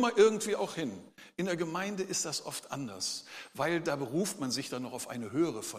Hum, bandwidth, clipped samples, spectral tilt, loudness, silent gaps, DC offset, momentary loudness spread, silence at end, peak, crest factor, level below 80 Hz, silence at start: none; 15.5 kHz; under 0.1%; -3.5 dB/octave; -33 LUFS; none; under 0.1%; 10 LU; 0 s; -12 dBFS; 22 dB; -78 dBFS; 0 s